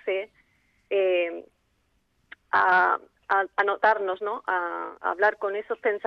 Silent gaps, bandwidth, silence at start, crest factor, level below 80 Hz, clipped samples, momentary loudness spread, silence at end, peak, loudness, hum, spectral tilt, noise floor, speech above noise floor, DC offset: none; 6.4 kHz; 0.05 s; 16 dB; -72 dBFS; under 0.1%; 10 LU; 0.1 s; -10 dBFS; -25 LUFS; none; -5 dB/octave; -70 dBFS; 45 dB; under 0.1%